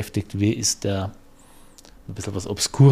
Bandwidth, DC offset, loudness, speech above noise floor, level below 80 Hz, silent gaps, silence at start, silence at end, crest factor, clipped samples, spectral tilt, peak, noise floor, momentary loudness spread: 15 kHz; under 0.1%; -24 LUFS; 27 dB; -48 dBFS; none; 0 s; 0 s; 18 dB; under 0.1%; -5 dB/octave; -4 dBFS; -48 dBFS; 14 LU